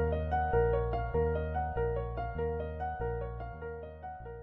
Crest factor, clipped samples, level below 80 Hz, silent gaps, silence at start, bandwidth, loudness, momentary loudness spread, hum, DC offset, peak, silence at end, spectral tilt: 16 dB; under 0.1%; -40 dBFS; none; 0 s; 4.6 kHz; -34 LUFS; 14 LU; none; under 0.1%; -16 dBFS; 0 s; -7 dB/octave